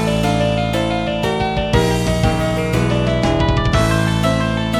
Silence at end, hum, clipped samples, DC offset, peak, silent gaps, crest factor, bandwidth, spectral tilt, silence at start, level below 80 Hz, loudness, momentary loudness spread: 0 s; none; under 0.1%; under 0.1%; 0 dBFS; none; 16 dB; 16.5 kHz; -6 dB/octave; 0 s; -26 dBFS; -17 LUFS; 3 LU